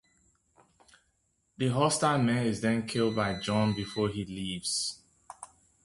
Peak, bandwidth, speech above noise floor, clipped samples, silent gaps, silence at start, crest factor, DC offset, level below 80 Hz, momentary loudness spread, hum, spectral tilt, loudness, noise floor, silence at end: -12 dBFS; 11.5 kHz; 45 dB; under 0.1%; none; 1.6 s; 20 dB; under 0.1%; -60 dBFS; 22 LU; none; -4.5 dB/octave; -29 LUFS; -74 dBFS; 0.4 s